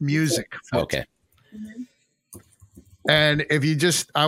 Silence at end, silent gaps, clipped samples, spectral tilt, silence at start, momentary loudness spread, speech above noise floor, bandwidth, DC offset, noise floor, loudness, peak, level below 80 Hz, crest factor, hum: 0 s; none; under 0.1%; -4 dB/octave; 0 s; 22 LU; 30 dB; 16.5 kHz; under 0.1%; -52 dBFS; -22 LUFS; -2 dBFS; -54 dBFS; 22 dB; none